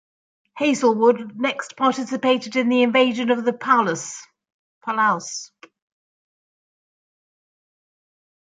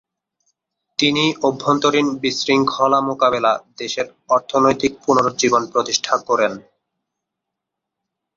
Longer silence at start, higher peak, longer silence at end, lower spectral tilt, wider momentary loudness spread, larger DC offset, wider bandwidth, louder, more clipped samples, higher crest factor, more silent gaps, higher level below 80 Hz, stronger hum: second, 0.55 s vs 1 s; about the same, -4 dBFS vs -2 dBFS; first, 3.15 s vs 1.75 s; about the same, -3.5 dB/octave vs -3.5 dB/octave; first, 13 LU vs 8 LU; neither; first, 9.4 kHz vs 7.6 kHz; about the same, -20 LUFS vs -18 LUFS; neither; about the same, 20 dB vs 18 dB; first, 4.52-4.81 s vs none; second, -74 dBFS vs -58 dBFS; neither